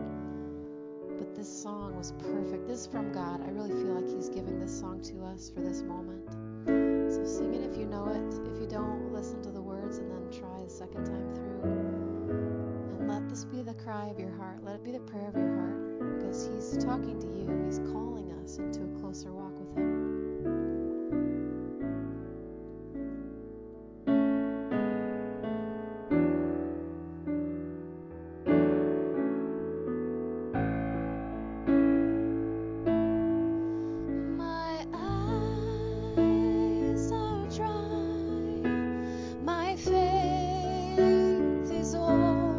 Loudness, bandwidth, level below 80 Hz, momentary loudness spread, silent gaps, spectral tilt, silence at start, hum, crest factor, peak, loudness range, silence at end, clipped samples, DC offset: -32 LUFS; 7.6 kHz; -48 dBFS; 14 LU; none; -7 dB/octave; 0 s; none; 18 dB; -14 dBFS; 7 LU; 0 s; under 0.1%; under 0.1%